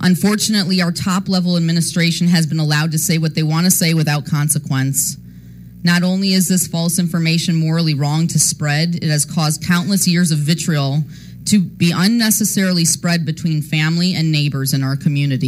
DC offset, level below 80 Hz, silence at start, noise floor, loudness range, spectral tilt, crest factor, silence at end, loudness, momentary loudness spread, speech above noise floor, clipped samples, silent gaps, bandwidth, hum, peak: under 0.1%; -52 dBFS; 0 s; -36 dBFS; 1 LU; -4.5 dB/octave; 16 dB; 0 s; -16 LUFS; 4 LU; 21 dB; under 0.1%; none; 16 kHz; none; 0 dBFS